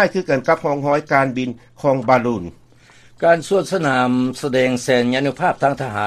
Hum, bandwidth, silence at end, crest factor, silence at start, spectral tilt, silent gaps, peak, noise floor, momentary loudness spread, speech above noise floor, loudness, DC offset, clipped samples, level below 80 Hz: none; 13.5 kHz; 0 s; 18 dB; 0 s; -5.5 dB/octave; none; 0 dBFS; -48 dBFS; 6 LU; 30 dB; -18 LUFS; under 0.1%; under 0.1%; -54 dBFS